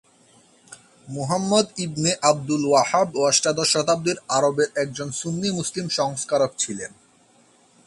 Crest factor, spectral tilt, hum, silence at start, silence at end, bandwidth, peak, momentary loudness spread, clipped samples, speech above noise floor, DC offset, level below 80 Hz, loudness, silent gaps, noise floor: 20 dB; -3.5 dB/octave; none; 0.7 s; 1 s; 11.5 kHz; -4 dBFS; 9 LU; under 0.1%; 35 dB; under 0.1%; -62 dBFS; -22 LUFS; none; -57 dBFS